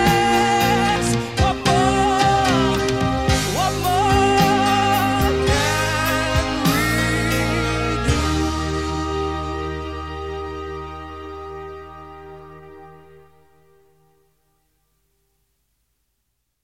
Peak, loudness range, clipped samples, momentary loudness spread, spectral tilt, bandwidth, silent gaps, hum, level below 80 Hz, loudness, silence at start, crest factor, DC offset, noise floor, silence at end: -4 dBFS; 17 LU; under 0.1%; 17 LU; -4.5 dB/octave; 16.5 kHz; none; none; -34 dBFS; -19 LUFS; 0 s; 18 dB; 0.3%; -73 dBFS; 3.65 s